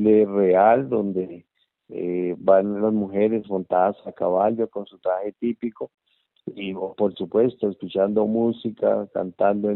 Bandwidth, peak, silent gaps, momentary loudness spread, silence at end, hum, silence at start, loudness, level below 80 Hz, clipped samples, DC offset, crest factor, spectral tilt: 4.2 kHz; -4 dBFS; none; 13 LU; 0 s; none; 0 s; -22 LUFS; -66 dBFS; under 0.1%; under 0.1%; 18 dB; -6.5 dB/octave